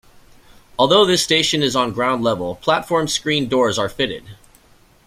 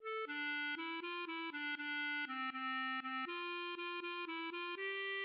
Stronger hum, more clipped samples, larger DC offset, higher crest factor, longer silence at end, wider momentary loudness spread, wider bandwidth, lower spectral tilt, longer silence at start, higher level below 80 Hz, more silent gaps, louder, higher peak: neither; neither; neither; first, 18 dB vs 10 dB; first, 0.75 s vs 0 s; first, 9 LU vs 4 LU; first, 16 kHz vs 5.6 kHz; first, -3.5 dB/octave vs 3 dB/octave; first, 0.8 s vs 0 s; first, -50 dBFS vs under -90 dBFS; neither; first, -17 LUFS vs -41 LUFS; first, 0 dBFS vs -34 dBFS